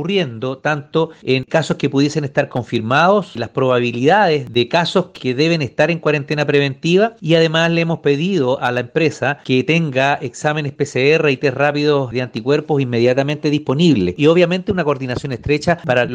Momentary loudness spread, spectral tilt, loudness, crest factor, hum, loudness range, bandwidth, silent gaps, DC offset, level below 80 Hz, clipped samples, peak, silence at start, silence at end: 6 LU; -6 dB/octave; -16 LUFS; 16 dB; none; 1 LU; 9.6 kHz; none; under 0.1%; -50 dBFS; under 0.1%; 0 dBFS; 0 s; 0 s